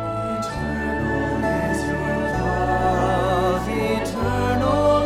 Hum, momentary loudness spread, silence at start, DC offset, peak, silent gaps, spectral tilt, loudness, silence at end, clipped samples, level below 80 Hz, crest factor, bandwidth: none; 5 LU; 0 s; under 0.1%; -8 dBFS; none; -6.5 dB/octave; -22 LUFS; 0 s; under 0.1%; -34 dBFS; 14 dB; 16 kHz